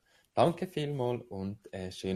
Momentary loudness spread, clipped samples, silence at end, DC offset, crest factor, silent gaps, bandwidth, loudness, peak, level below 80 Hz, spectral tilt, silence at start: 12 LU; under 0.1%; 0 s; under 0.1%; 22 dB; none; 14.5 kHz; -34 LUFS; -12 dBFS; -66 dBFS; -6.5 dB/octave; 0.35 s